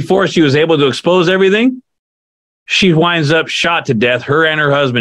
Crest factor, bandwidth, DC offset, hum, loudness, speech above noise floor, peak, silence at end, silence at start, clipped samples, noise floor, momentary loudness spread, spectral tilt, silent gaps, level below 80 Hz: 12 dB; 11.5 kHz; under 0.1%; none; -11 LUFS; over 79 dB; 0 dBFS; 0 s; 0 s; under 0.1%; under -90 dBFS; 3 LU; -5.5 dB/octave; 1.99-2.66 s; -52 dBFS